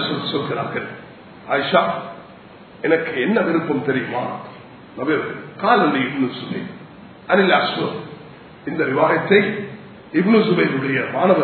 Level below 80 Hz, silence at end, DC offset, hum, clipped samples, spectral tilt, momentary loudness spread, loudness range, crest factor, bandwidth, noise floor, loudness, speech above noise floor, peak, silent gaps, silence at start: -64 dBFS; 0 s; under 0.1%; none; under 0.1%; -9.5 dB/octave; 20 LU; 3 LU; 20 dB; 4.6 kHz; -42 dBFS; -19 LUFS; 23 dB; 0 dBFS; none; 0 s